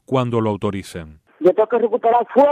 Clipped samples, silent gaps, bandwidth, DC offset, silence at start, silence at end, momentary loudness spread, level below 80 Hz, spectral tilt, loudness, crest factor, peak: under 0.1%; none; 13 kHz; under 0.1%; 0.1 s; 0 s; 14 LU; -52 dBFS; -7.5 dB/octave; -18 LUFS; 14 dB; -4 dBFS